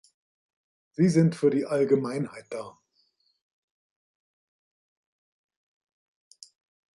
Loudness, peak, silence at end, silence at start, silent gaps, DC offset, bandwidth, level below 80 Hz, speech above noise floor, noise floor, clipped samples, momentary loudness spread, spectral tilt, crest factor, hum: -25 LUFS; -10 dBFS; 4.25 s; 1 s; none; under 0.1%; 11.5 kHz; -74 dBFS; 46 dB; -71 dBFS; under 0.1%; 17 LU; -7.5 dB/octave; 20 dB; none